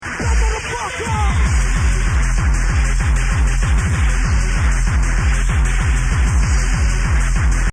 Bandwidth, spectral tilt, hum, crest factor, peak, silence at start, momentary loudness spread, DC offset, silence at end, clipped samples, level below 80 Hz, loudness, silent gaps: 10 kHz; -4.5 dB/octave; none; 10 dB; -4 dBFS; 0 s; 1 LU; under 0.1%; 0 s; under 0.1%; -16 dBFS; -18 LUFS; none